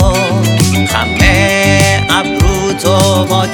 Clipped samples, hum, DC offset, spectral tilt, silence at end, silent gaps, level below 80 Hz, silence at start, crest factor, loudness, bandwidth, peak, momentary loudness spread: 0.7%; none; under 0.1%; -4.5 dB/octave; 0 s; none; -20 dBFS; 0 s; 10 dB; -10 LUFS; 18.5 kHz; 0 dBFS; 4 LU